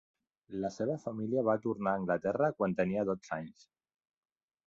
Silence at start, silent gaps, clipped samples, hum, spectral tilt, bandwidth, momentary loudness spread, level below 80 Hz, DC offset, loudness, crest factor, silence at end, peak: 0.5 s; none; under 0.1%; none; -7.5 dB/octave; 7.6 kHz; 10 LU; -68 dBFS; under 0.1%; -34 LUFS; 18 dB; 1.15 s; -16 dBFS